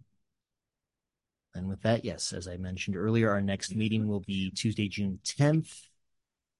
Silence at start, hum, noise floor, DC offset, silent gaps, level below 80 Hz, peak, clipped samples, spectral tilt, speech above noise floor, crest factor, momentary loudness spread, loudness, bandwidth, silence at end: 1.55 s; none; -89 dBFS; under 0.1%; none; -54 dBFS; -12 dBFS; under 0.1%; -5.5 dB/octave; 60 dB; 20 dB; 12 LU; -31 LUFS; 11.5 kHz; 0.8 s